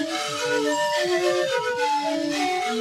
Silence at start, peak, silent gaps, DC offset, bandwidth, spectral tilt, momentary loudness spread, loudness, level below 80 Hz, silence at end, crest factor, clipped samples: 0 s; -10 dBFS; none; under 0.1%; 16 kHz; -2.5 dB/octave; 3 LU; -23 LUFS; -66 dBFS; 0 s; 14 dB; under 0.1%